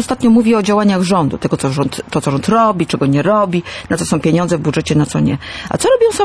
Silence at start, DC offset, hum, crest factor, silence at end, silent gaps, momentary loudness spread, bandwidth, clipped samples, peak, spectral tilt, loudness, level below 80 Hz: 0 s; under 0.1%; none; 10 dB; 0 s; none; 7 LU; 11 kHz; under 0.1%; -2 dBFS; -6 dB/octave; -14 LUFS; -42 dBFS